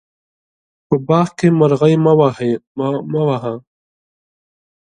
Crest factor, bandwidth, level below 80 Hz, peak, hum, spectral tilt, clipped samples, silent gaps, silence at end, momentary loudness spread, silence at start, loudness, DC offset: 16 dB; 9.6 kHz; -56 dBFS; 0 dBFS; none; -8 dB/octave; under 0.1%; 2.67-2.75 s; 1.35 s; 9 LU; 0.9 s; -15 LUFS; under 0.1%